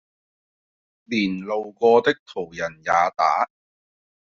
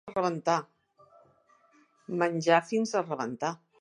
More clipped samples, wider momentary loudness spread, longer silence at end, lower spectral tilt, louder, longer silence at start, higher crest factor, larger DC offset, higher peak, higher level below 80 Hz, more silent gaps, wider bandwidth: neither; about the same, 11 LU vs 10 LU; first, 0.85 s vs 0.25 s; second, -3 dB/octave vs -5 dB/octave; first, -22 LUFS vs -29 LUFS; first, 1.1 s vs 0.05 s; about the same, 20 dB vs 22 dB; neither; first, -4 dBFS vs -8 dBFS; first, -64 dBFS vs -76 dBFS; first, 2.20-2.26 s vs none; second, 7.2 kHz vs 11 kHz